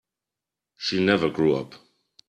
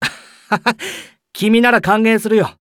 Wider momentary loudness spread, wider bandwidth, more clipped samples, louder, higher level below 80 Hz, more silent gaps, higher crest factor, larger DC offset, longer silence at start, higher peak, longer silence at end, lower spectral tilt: second, 9 LU vs 15 LU; second, 9.4 kHz vs 16.5 kHz; neither; second, -23 LUFS vs -15 LUFS; second, -60 dBFS vs -52 dBFS; neither; first, 22 dB vs 14 dB; neither; first, 0.8 s vs 0 s; about the same, -4 dBFS vs -2 dBFS; first, 0.55 s vs 0.1 s; about the same, -6 dB/octave vs -5 dB/octave